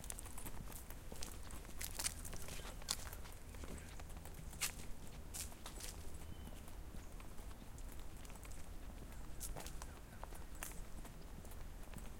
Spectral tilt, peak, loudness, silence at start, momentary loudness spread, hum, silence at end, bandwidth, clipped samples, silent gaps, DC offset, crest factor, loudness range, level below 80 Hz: -2.5 dB/octave; -18 dBFS; -50 LUFS; 0 s; 12 LU; none; 0 s; 17 kHz; under 0.1%; none; under 0.1%; 30 dB; 7 LU; -52 dBFS